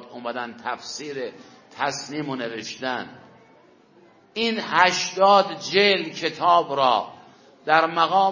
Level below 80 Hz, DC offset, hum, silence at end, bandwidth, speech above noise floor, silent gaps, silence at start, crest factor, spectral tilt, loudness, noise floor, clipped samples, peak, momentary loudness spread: -72 dBFS; under 0.1%; none; 0 s; 7.4 kHz; 32 dB; none; 0 s; 22 dB; -3 dB/octave; -22 LUFS; -54 dBFS; under 0.1%; -2 dBFS; 14 LU